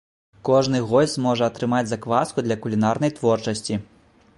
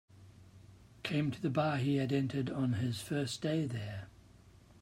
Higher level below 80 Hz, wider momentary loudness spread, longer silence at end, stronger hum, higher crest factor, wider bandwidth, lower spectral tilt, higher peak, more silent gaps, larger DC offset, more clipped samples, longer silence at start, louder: first, -56 dBFS vs -66 dBFS; second, 7 LU vs 11 LU; first, 0.55 s vs 0.1 s; neither; about the same, 18 dB vs 18 dB; second, 11.5 kHz vs 16 kHz; about the same, -6 dB/octave vs -6.5 dB/octave; first, -4 dBFS vs -18 dBFS; neither; neither; neither; first, 0.45 s vs 0.2 s; first, -22 LUFS vs -35 LUFS